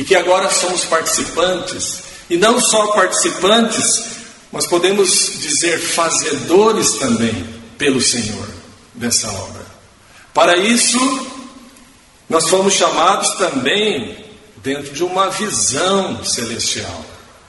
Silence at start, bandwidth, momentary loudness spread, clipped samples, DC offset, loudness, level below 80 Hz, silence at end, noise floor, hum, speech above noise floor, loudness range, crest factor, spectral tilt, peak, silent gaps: 0 s; 12 kHz; 15 LU; under 0.1%; under 0.1%; -14 LUFS; -50 dBFS; 0.3 s; -45 dBFS; none; 30 dB; 3 LU; 16 dB; -2 dB/octave; 0 dBFS; none